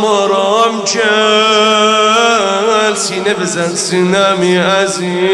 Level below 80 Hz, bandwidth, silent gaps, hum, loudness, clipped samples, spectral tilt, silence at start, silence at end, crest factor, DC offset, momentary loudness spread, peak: -60 dBFS; 12.5 kHz; none; none; -11 LUFS; under 0.1%; -3 dB/octave; 0 s; 0 s; 12 dB; under 0.1%; 6 LU; 0 dBFS